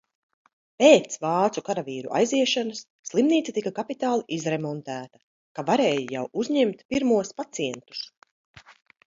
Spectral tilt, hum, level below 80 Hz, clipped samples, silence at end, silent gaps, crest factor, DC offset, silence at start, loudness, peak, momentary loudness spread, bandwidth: -4.5 dB/octave; none; -66 dBFS; under 0.1%; 0.5 s; 2.90-3.03 s, 5.23-5.55 s, 6.85-6.89 s, 8.17-8.22 s, 8.31-8.54 s; 22 dB; under 0.1%; 0.8 s; -24 LUFS; -2 dBFS; 14 LU; 7.8 kHz